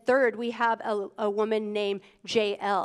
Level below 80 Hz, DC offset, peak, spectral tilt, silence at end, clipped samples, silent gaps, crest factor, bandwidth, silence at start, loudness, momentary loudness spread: -76 dBFS; under 0.1%; -12 dBFS; -4.5 dB/octave; 0 s; under 0.1%; none; 16 dB; 11 kHz; 0.05 s; -28 LUFS; 6 LU